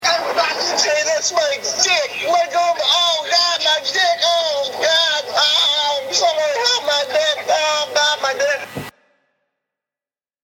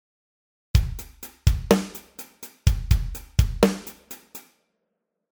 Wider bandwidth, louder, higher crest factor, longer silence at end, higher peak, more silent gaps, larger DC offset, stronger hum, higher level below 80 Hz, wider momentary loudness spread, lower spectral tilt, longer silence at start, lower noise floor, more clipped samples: second, 17.5 kHz vs over 20 kHz; first, -16 LUFS vs -24 LUFS; second, 18 dB vs 24 dB; first, 1.55 s vs 0.95 s; about the same, 0 dBFS vs -2 dBFS; neither; neither; neither; second, -66 dBFS vs -30 dBFS; second, 5 LU vs 19 LU; second, 0.5 dB/octave vs -6 dB/octave; second, 0 s vs 0.75 s; first, under -90 dBFS vs -79 dBFS; neither